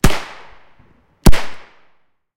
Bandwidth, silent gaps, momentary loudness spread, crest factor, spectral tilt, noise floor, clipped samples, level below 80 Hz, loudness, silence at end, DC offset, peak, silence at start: 17 kHz; none; 23 LU; 14 dB; -5 dB/octave; -57 dBFS; 1%; -22 dBFS; -19 LUFS; 0.7 s; under 0.1%; 0 dBFS; 0.05 s